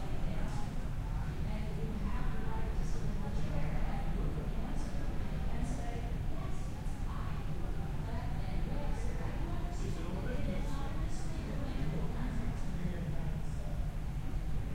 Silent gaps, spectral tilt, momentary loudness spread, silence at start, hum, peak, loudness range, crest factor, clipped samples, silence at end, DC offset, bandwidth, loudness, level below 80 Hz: none; -7 dB/octave; 2 LU; 0 s; none; -22 dBFS; 1 LU; 12 dB; under 0.1%; 0 s; under 0.1%; 11.5 kHz; -40 LUFS; -36 dBFS